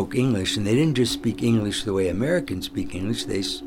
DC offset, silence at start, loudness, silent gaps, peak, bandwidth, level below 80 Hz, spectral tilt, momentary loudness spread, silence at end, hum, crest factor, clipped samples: under 0.1%; 0 s; -23 LUFS; none; -10 dBFS; 17.5 kHz; -46 dBFS; -5.5 dB/octave; 8 LU; 0 s; none; 14 dB; under 0.1%